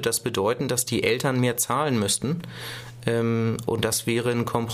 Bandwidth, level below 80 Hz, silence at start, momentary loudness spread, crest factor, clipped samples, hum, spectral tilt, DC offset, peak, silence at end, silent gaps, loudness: 15.5 kHz; -56 dBFS; 0 s; 8 LU; 18 dB; under 0.1%; none; -4 dB/octave; under 0.1%; -6 dBFS; 0 s; none; -24 LUFS